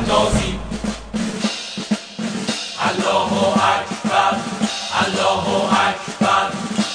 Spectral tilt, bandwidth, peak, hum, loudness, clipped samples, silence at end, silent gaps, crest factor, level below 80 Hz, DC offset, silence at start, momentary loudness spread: -4 dB/octave; 10 kHz; -2 dBFS; none; -19 LUFS; under 0.1%; 0 s; none; 16 dB; -38 dBFS; under 0.1%; 0 s; 8 LU